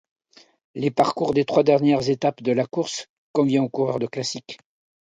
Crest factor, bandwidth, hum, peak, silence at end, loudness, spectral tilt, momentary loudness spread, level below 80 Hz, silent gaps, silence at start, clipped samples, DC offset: 18 dB; 9.4 kHz; none; -4 dBFS; 0.5 s; -22 LUFS; -5.5 dB/octave; 14 LU; -64 dBFS; 3.09-3.34 s; 0.75 s; under 0.1%; under 0.1%